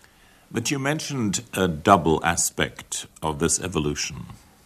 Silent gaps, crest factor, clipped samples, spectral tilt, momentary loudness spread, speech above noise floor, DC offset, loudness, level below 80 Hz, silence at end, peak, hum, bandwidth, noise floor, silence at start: none; 24 dB; under 0.1%; -3.5 dB/octave; 13 LU; 30 dB; under 0.1%; -23 LUFS; -46 dBFS; 0.3 s; 0 dBFS; none; 14 kHz; -54 dBFS; 0.5 s